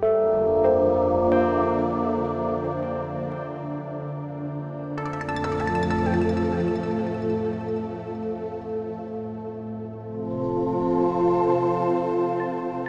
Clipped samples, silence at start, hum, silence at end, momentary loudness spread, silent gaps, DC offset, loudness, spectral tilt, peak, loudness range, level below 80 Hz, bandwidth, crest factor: under 0.1%; 0 s; none; 0 s; 12 LU; none; under 0.1%; -25 LUFS; -8.5 dB/octave; -8 dBFS; 7 LU; -48 dBFS; 8.4 kHz; 16 dB